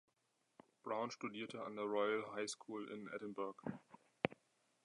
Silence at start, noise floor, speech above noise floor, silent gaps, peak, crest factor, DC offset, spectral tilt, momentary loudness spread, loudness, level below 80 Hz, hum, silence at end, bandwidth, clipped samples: 0.85 s; -83 dBFS; 39 dB; none; -16 dBFS; 30 dB; under 0.1%; -4.5 dB/octave; 10 LU; -45 LUFS; -82 dBFS; none; 0.5 s; 11 kHz; under 0.1%